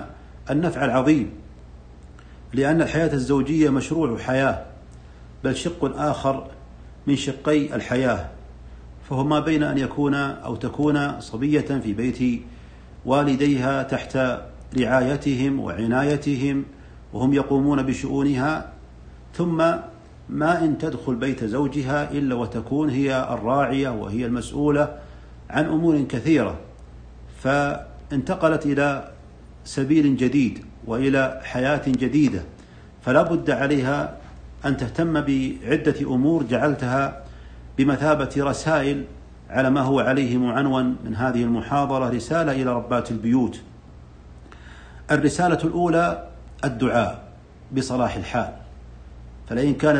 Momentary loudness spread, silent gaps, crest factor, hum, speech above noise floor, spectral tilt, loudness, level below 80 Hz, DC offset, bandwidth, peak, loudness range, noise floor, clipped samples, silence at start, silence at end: 11 LU; none; 18 dB; none; 23 dB; -6.5 dB/octave; -22 LUFS; -44 dBFS; under 0.1%; 9.6 kHz; -4 dBFS; 3 LU; -45 dBFS; under 0.1%; 0 s; 0 s